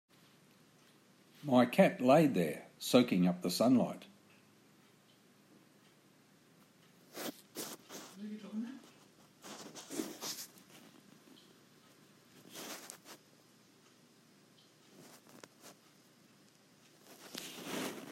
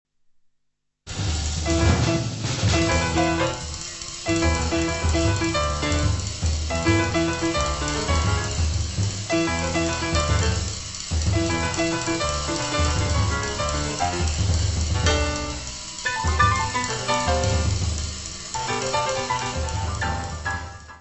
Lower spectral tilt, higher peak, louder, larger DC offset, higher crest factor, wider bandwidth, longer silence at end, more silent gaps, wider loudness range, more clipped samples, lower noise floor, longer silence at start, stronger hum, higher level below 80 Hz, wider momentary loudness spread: first, -5.5 dB/octave vs -4 dB/octave; second, -12 dBFS vs -6 dBFS; second, -34 LUFS vs -23 LUFS; second, under 0.1% vs 0.2%; first, 26 dB vs 18 dB; first, 16 kHz vs 8.4 kHz; about the same, 0 s vs 0 s; neither; first, 23 LU vs 1 LU; neither; second, -66 dBFS vs -72 dBFS; first, 1.45 s vs 1.05 s; neither; second, -84 dBFS vs -30 dBFS; first, 29 LU vs 8 LU